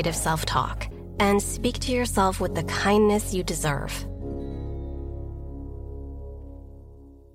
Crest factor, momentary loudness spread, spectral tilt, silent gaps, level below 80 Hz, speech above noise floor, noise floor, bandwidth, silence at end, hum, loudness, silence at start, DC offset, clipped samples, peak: 18 dB; 17 LU; -4.5 dB/octave; none; -36 dBFS; 23 dB; -47 dBFS; 16 kHz; 0.15 s; none; -26 LUFS; 0 s; under 0.1%; under 0.1%; -8 dBFS